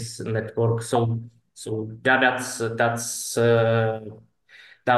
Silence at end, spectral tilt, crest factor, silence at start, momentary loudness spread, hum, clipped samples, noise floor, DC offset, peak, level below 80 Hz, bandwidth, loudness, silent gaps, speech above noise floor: 0 s; -5 dB/octave; 18 dB; 0 s; 13 LU; none; under 0.1%; -51 dBFS; under 0.1%; -6 dBFS; -64 dBFS; 12.5 kHz; -23 LUFS; none; 28 dB